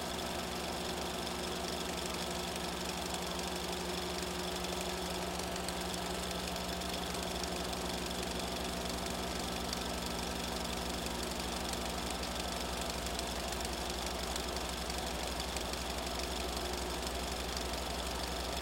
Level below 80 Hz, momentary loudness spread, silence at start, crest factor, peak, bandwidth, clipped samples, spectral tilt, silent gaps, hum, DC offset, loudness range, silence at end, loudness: -48 dBFS; 1 LU; 0 s; 20 dB; -18 dBFS; 17 kHz; under 0.1%; -3 dB/octave; none; 60 Hz at -45 dBFS; under 0.1%; 0 LU; 0 s; -37 LUFS